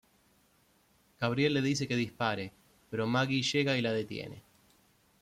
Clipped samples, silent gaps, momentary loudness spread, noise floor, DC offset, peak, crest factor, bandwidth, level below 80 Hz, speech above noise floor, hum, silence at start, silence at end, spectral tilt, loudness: under 0.1%; none; 12 LU; -68 dBFS; under 0.1%; -16 dBFS; 18 dB; 15 kHz; -68 dBFS; 37 dB; none; 1.2 s; 0.8 s; -5 dB/octave; -31 LUFS